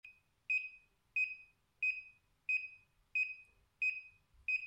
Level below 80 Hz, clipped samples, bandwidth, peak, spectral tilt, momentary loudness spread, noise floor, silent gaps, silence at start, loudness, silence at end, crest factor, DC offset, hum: -78 dBFS; under 0.1%; 10.5 kHz; -28 dBFS; 0.5 dB/octave; 14 LU; -60 dBFS; none; 0.05 s; -38 LUFS; 0 s; 14 dB; under 0.1%; none